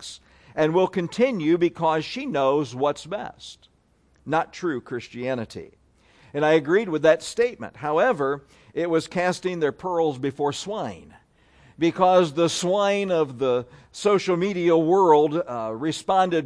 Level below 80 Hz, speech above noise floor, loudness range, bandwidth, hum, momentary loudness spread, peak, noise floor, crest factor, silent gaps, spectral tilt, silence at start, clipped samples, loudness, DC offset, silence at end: -62 dBFS; 39 dB; 6 LU; 11 kHz; none; 14 LU; -4 dBFS; -62 dBFS; 20 dB; none; -5.5 dB/octave; 0 s; under 0.1%; -23 LUFS; under 0.1%; 0 s